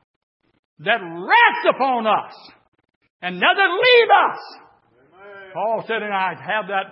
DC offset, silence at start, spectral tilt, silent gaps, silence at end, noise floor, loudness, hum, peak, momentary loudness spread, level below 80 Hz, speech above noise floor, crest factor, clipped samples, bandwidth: under 0.1%; 0.8 s; -8 dB/octave; 2.68-2.72 s, 2.96-3.01 s, 3.10-3.20 s; 0 s; -55 dBFS; -17 LUFS; none; -2 dBFS; 15 LU; -80 dBFS; 37 dB; 18 dB; under 0.1%; 5.8 kHz